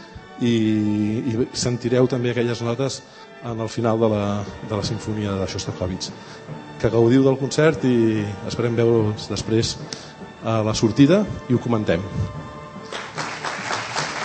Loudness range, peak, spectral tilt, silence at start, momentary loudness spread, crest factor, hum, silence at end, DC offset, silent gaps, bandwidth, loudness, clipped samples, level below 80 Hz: 5 LU; -2 dBFS; -6 dB/octave; 0 s; 16 LU; 20 dB; none; 0 s; under 0.1%; none; 8.8 kHz; -21 LUFS; under 0.1%; -48 dBFS